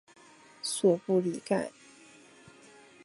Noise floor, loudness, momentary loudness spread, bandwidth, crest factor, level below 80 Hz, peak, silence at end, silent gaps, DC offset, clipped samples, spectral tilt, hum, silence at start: -56 dBFS; -30 LUFS; 11 LU; 12 kHz; 20 dB; -78 dBFS; -12 dBFS; 1.35 s; none; under 0.1%; under 0.1%; -5 dB/octave; none; 0.65 s